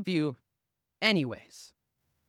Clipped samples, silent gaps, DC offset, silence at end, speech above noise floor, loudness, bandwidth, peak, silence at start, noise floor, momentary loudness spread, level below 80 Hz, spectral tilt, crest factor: under 0.1%; none; under 0.1%; 0.6 s; 55 dB; -29 LUFS; 15 kHz; -8 dBFS; 0 s; -85 dBFS; 24 LU; -76 dBFS; -5.5 dB/octave; 24 dB